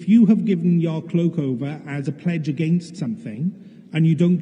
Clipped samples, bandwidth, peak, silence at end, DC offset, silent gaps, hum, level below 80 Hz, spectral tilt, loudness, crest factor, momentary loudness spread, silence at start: under 0.1%; 9.2 kHz; -6 dBFS; 0 s; under 0.1%; none; none; -76 dBFS; -9 dB/octave; -21 LUFS; 14 dB; 12 LU; 0 s